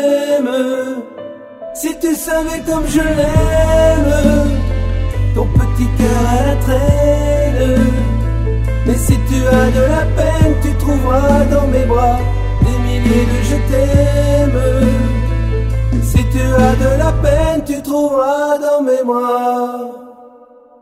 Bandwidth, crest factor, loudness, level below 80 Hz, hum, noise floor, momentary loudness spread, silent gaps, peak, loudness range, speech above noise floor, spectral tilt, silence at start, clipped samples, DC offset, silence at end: 15.5 kHz; 12 dB; -14 LUFS; -18 dBFS; none; -42 dBFS; 6 LU; none; 0 dBFS; 2 LU; 30 dB; -6.5 dB/octave; 0 s; under 0.1%; under 0.1%; 0.55 s